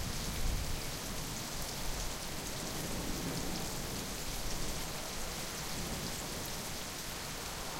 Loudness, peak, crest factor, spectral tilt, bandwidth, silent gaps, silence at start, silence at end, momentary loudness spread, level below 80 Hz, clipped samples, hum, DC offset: -39 LUFS; -22 dBFS; 16 dB; -3 dB/octave; 16 kHz; none; 0 s; 0 s; 2 LU; -44 dBFS; under 0.1%; none; under 0.1%